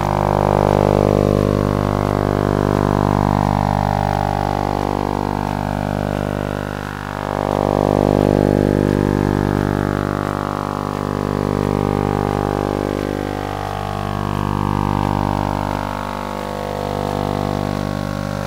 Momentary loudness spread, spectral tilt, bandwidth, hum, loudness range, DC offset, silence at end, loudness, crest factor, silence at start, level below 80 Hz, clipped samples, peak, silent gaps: 8 LU; -7.5 dB/octave; 16 kHz; 50 Hz at -25 dBFS; 4 LU; under 0.1%; 0 s; -19 LUFS; 18 dB; 0 s; -30 dBFS; under 0.1%; 0 dBFS; none